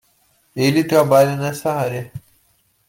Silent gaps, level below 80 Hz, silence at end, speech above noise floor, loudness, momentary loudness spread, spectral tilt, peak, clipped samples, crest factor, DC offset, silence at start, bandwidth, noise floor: none; -58 dBFS; 0.7 s; 45 dB; -17 LUFS; 20 LU; -6 dB/octave; -2 dBFS; under 0.1%; 18 dB; under 0.1%; 0.55 s; 17 kHz; -61 dBFS